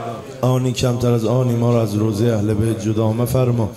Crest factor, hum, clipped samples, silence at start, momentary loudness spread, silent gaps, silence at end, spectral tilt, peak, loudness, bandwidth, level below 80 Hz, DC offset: 12 dB; none; under 0.1%; 0 s; 2 LU; none; 0 s; -7 dB/octave; -4 dBFS; -18 LUFS; 14.5 kHz; -44 dBFS; under 0.1%